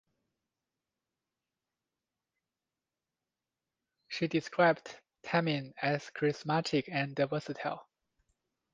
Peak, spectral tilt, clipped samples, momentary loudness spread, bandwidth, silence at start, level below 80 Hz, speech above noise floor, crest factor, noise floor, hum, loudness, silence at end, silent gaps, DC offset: -12 dBFS; -6 dB/octave; under 0.1%; 12 LU; 9.6 kHz; 4.1 s; -78 dBFS; over 58 dB; 24 dB; under -90 dBFS; none; -33 LUFS; 0.9 s; none; under 0.1%